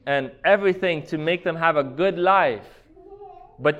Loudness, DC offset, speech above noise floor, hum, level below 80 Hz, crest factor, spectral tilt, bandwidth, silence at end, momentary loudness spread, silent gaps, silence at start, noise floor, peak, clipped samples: -21 LUFS; under 0.1%; 23 dB; none; -58 dBFS; 18 dB; -7 dB/octave; 8 kHz; 0 s; 7 LU; none; 0.05 s; -44 dBFS; -4 dBFS; under 0.1%